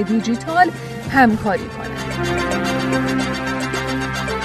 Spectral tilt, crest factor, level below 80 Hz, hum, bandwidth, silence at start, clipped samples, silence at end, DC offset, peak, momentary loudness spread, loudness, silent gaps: -5 dB/octave; 18 dB; -40 dBFS; none; 13.5 kHz; 0 s; under 0.1%; 0 s; under 0.1%; 0 dBFS; 9 LU; -19 LUFS; none